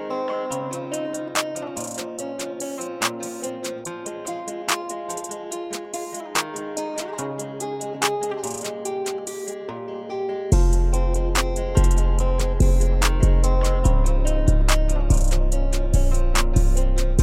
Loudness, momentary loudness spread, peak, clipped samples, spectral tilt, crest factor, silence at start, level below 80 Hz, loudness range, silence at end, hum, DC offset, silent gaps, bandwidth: -24 LUFS; 11 LU; -4 dBFS; under 0.1%; -5 dB/octave; 14 dB; 0 s; -22 dBFS; 8 LU; 0 s; none; under 0.1%; none; 15.5 kHz